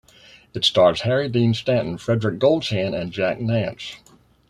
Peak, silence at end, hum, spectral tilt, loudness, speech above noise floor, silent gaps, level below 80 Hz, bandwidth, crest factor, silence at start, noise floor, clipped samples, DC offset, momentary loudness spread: -4 dBFS; 0.55 s; none; -6 dB/octave; -20 LUFS; 30 dB; none; -54 dBFS; 11.5 kHz; 18 dB; 0.55 s; -50 dBFS; under 0.1%; under 0.1%; 10 LU